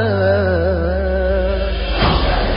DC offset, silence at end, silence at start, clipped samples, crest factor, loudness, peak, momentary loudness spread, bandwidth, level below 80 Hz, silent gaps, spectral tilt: under 0.1%; 0 s; 0 s; under 0.1%; 14 dB; -17 LUFS; -2 dBFS; 4 LU; 5.4 kHz; -20 dBFS; none; -11 dB/octave